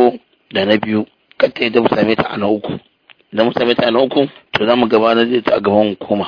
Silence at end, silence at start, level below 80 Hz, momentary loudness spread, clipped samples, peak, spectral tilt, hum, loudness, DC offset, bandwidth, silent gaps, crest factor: 0 s; 0 s; -52 dBFS; 9 LU; under 0.1%; 0 dBFS; -7.5 dB/octave; none; -15 LUFS; under 0.1%; 5.4 kHz; none; 14 dB